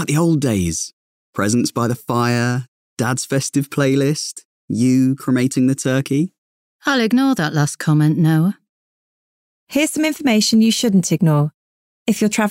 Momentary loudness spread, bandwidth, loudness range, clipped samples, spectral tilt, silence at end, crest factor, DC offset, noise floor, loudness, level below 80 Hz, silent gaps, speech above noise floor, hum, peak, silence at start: 10 LU; 16 kHz; 2 LU; under 0.1%; -5 dB/octave; 0 s; 12 dB; under 0.1%; under -90 dBFS; -18 LUFS; -54 dBFS; 0.93-1.33 s, 2.68-2.97 s, 4.45-4.68 s, 6.38-6.80 s, 8.69-9.67 s, 11.54-12.06 s; over 74 dB; none; -6 dBFS; 0 s